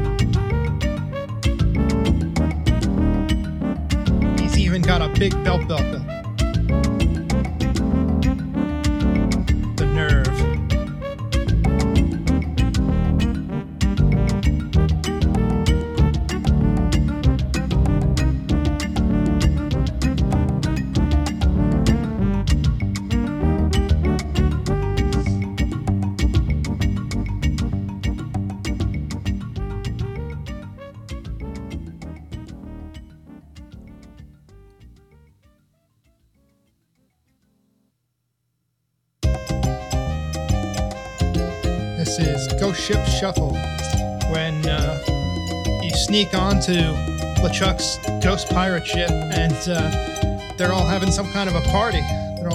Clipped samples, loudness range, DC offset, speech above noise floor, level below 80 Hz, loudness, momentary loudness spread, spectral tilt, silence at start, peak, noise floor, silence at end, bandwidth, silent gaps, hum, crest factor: under 0.1%; 9 LU; under 0.1%; 53 dB; -26 dBFS; -21 LUFS; 8 LU; -6 dB/octave; 0 s; -4 dBFS; -73 dBFS; 0 s; 14 kHz; none; none; 16 dB